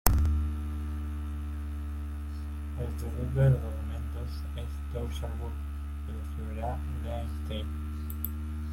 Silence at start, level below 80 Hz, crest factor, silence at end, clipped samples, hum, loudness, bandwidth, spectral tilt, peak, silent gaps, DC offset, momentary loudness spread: 0.05 s; -36 dBFS; 30 dB; 0 s; under 0.1%; none; -34 LUFS; 16.5 kHz; -6.5 dB/octave; -2 dBFS; none; under 0.1%; 11 LU